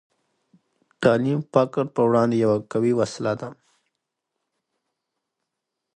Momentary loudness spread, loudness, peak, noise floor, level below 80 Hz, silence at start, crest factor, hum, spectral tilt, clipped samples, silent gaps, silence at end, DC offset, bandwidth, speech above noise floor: 8 LU; -22 LUFS; -4 dBFS; -82 dBFS; -64 dBFS; 1 s; 22 dB; none; -7 dB/octave; under 0.1%; none; 2.45 s; under 0.1%; 9.6 kHz; 61 dB